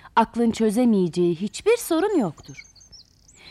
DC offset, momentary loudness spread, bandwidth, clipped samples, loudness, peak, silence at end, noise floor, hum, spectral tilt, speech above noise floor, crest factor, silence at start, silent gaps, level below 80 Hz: under 0.1%; 15 LU; 14.5 kHz; under 0.1%; -22 LUFS; -8 dBFS; 0.55 s; -51 dBFS; none; -5.5 dB/octave; 30 dB; 16 dB; 0.05 s; none; -56 dBFS